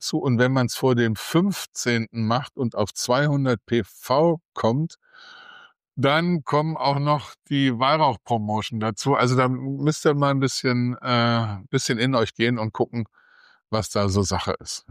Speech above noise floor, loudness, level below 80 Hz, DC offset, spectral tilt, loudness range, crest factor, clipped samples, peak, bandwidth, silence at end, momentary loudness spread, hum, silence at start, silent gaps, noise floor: 27 dB; -23 LUFS; -56 dBFS; under 0.1%; -5.5 dB/octave; 2 LU; 16 dB; under 0.1%; -8 dBFS; 15.5 kHz; 0.1 s; 6 LU; none; 0 s; 4.45-4.52 s; -50 dBFS